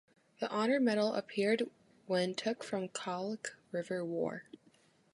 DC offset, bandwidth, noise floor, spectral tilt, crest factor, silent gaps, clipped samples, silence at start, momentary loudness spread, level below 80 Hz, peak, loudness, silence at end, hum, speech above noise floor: under 0.1%; 11.5 kHz; -68 dBFS; -5 dB/octave; 16 dB; none; under 0.1%; 0.4 s; 11 LU; -84 dBFS; -20 dBFS; -36 LUFS; 0.6 s; none; 33 dB